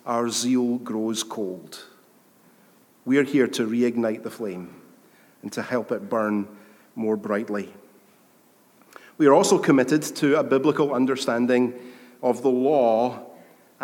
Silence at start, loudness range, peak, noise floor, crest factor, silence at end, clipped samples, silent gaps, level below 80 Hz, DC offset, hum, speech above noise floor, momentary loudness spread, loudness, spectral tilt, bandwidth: 0.05 s; 8 LU; -4 dBFS; -58 dBFS; 20 dB; 0 s; under 0.1%; none; -80 dBFS; under 0.1%; none; 35 dB; 19 LU; -23 LUFS; -5 dB/octave; 18 kHz